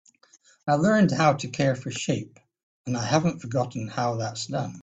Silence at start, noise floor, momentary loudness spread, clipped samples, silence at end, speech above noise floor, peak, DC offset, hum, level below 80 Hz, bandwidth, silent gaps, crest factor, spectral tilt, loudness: 0.65 s; -59 dBFS; 11 LU; under 0.1%; 0 s; 35 dB; -8 dBFS; under 0.1%; none; -60 dBFS; 9.2 kHz; 2.63-2.85 s; 18 dB; -5.5 dB/octave; -25 LUFS